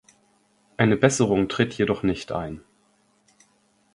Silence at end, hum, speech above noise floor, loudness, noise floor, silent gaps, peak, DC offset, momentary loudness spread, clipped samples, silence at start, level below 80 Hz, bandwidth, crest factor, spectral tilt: 1.35 s; none; 42 dB; -23 LUFS; -64 dBFS; none; -2 dBFS; under 0.1%; 16 LU; under 0.1%; 0.8 s; -52 dBFS; 11.5 kHz; 24 dB; -5.5 dB/octave